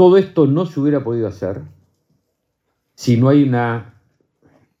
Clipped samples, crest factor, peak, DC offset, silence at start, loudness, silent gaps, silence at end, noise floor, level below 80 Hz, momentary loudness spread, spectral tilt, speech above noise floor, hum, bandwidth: under 0.1%; 16 dB; 0 dBFS; under 0.1%; 0 s; -16 LUFS; none; 0.95 s; -71 dBFS; -64 dBFS; 13 LU; -8 dB/octave; 57 dB; none; 7.8 kHz